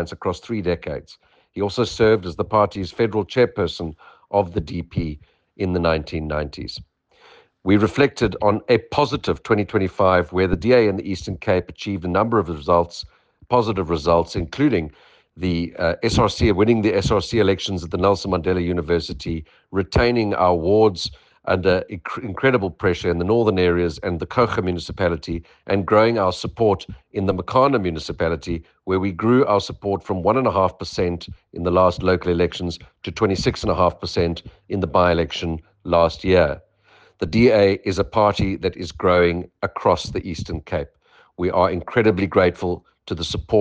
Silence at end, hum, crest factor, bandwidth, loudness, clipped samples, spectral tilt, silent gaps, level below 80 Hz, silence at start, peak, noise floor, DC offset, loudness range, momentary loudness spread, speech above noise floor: 0 s; none; 16 dB; 9.4 kHz; -20 LUFS; under 0.1%; -6.5 dB/octave; none; -40 dBFS; 0 s; -4 dBFS; -54 dBFS; under 0.1%; 3 LU; 12 LU; 35 dB